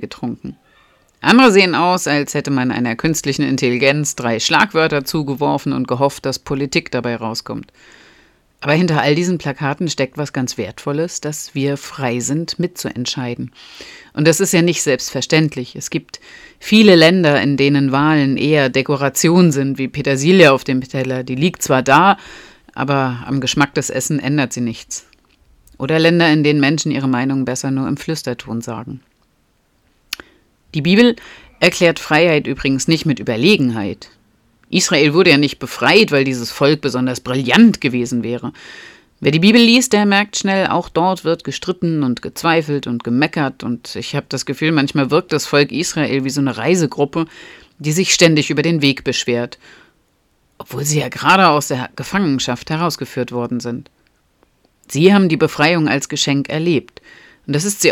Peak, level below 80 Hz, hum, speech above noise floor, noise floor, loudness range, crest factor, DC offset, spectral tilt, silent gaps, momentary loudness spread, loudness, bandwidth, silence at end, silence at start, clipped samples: 0 dBFS; -52 dBFS; none; 45 dB; -60 dBFS; 6 LU; 16 dB; under 0.1%; -4.5 dB/octave; none; 14 LU; -15 LUFS; 17 kHz; 0 s; 0 s; under 0.1%